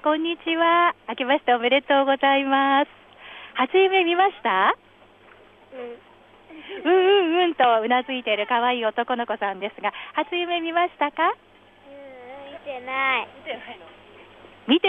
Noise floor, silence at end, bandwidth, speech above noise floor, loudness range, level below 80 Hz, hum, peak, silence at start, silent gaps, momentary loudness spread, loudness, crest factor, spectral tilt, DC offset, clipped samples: -52 dBFS; 0 s; 4 kHz; 30 dB; 6 LU; -68 dBFS; none; -6 dBFS; 0.05 s; none; 20 LU; -21 LUFS; 16 dB; -6 dB/octave; under 0.1%; under 0.1%